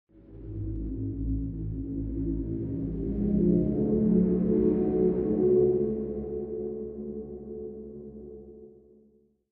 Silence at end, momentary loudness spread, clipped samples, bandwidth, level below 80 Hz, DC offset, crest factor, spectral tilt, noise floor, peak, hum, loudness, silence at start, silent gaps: 0.8 s; 18 LU; under 0.1%; 2.6 kHz; -40 dBFS; under 0.1%; 16 dB; -14 dB/octave; -63 dBFS; -12 dBFS; none; -28 LUFS; 0.15 s; none